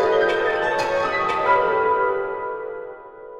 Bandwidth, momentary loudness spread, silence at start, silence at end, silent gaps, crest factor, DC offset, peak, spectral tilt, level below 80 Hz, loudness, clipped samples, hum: 10.5 kHz; 14 LU; 0 s; 0 s; none; 16 dB; 0.2%; -6 dBFS; -4.5 dB/octave; -52 dBFS; -21 LUFS; under 0.1%; none